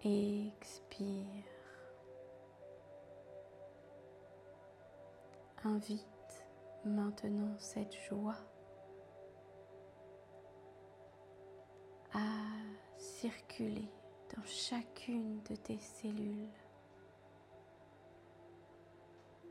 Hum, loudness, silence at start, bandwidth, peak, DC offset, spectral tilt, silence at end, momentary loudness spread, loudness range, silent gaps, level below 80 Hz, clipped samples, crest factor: none; -44 LUFS; 0 s; 12.5 kHz; -26 dBFS; under 0.1%; -5.5 dB/octave; 0 s; 21 LU; 14 LU; none; -78 dBFS; under 0.1%; 20 dB